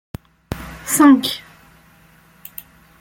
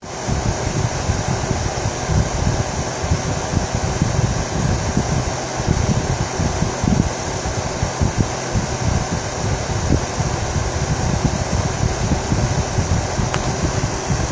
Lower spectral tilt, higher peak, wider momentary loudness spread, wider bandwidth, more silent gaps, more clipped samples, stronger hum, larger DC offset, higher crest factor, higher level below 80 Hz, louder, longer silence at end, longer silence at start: second, -3.5 dB/octave vs -5 dB/octave; about the same, -2 dBFS vs 0 dBFS; first, 26 LU vs 3 LU; first, 17 kHz vs 8 kHz; neither; neither; neither; neither; about the same, 18 dB vs 18 dB; second, -46 dBFS vs -26 dBFS; first, -15 LUFS vs -20 LUFS; first, 1.65 s vs 0 s; first, 0.5 s vs 0 s